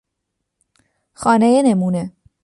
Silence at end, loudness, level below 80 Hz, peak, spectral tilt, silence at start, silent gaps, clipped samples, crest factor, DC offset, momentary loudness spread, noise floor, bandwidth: 0.35 s; -16 LUFS; -58 dBFS; -4 dBFS; -6.5 dB/octave; 1.2 s; none; under 0.1%; 16 dB; under 0.1%; 11 LU; -77 dBFS; 11.5 kHz